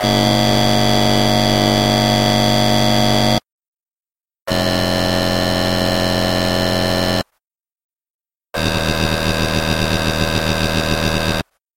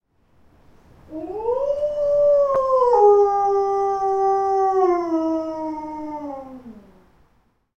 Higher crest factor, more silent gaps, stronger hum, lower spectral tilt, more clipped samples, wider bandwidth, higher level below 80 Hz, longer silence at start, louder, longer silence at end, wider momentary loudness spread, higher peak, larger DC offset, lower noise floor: about the same, 16 dB vs 16 dB; first, 3.52-3.58 s, 3.68-3.73 s, 3.91-3.96 s, 4.42-4.46 s, 7.84-7.89 s, 8.10-8.19 s vs none; neither; second, -4.5 dB/octave vs -6.5 dB/octave; neither; first, 16.5 kHz vs 6.8 kHz; first, -30 dBFS vs -54 dBFS; second, 0 s vs 1.1 s; first, -16 LUFS vs -19 LUFS; second, 0.35 s vs 0.95 s; second, 6 LU vs 18 LU; first, 0 dBFS vs -4 dBFS; neither; first, under -90 dBFS vs -63 dBFS